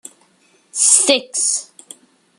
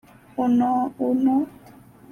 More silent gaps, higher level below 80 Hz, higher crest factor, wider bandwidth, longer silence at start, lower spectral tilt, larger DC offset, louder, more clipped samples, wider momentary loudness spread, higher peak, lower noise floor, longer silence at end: neither; second, -78 dBFS vs -62 dBFS; first, 20 dB vs 12 dB; first, 13.5 kHz vs 6.6 kHz; first, 0.75 s vs 0.35 s; second, 1.5 dB/octave vs -8 dB/octave; neither; first, -13 LUFS vs -22 LUFS; neither; about the same, 12 LU vs 10 LU; first, 0 dBFS vs -10 dBFS; first, -56 dBFS vs -48 dBFS; first, 0.75 s vs 0.6 s